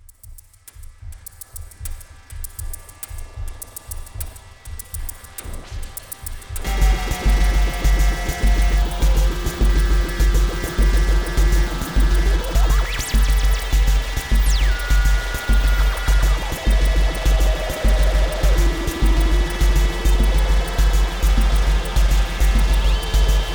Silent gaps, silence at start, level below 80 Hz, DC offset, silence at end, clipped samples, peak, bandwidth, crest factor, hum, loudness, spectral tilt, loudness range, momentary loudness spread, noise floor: none; 0.25 s; -18 dBFS; 0.3%; 0 s; under 0.1%; -6 dBFS; over 20 kHz; 12 dB; none; -20 LUFS; -4.5 dB/octave; 14 LU; 15 LU; -42 dBFS